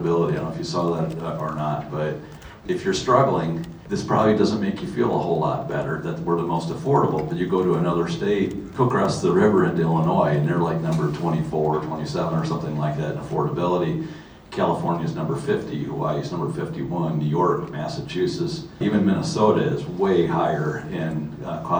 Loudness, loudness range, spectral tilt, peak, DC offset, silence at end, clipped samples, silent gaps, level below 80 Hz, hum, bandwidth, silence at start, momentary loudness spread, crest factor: -23 LUFS; 4 LU; -7 dB/octave; -2 dBFS; under 0.1%; 0 s; under 0.1%; none; -50 dBFS; none; over 20 kHz; 0 s; 9 LU; 20 dB